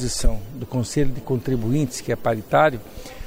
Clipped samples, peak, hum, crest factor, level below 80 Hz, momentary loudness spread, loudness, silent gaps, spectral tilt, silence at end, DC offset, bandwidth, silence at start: under 0.1%; -4 dBFS; none; 16 dB; -30 dBFS; 11 LU; -23 LUFS; none; -5.5 dB/octave; 0 s; under 0.1%; 16 kHz; 0 s